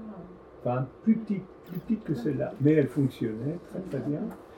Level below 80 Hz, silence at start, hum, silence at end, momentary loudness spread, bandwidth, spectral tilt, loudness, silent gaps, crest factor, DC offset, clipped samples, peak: -60 dBFS; 0 s; none; 0 s; 16 LU; 18 kHz; -9.5 dB/octave; -29 LUFS; none; 18 dB; under 0.1%; under 0.1%; -10 dBFS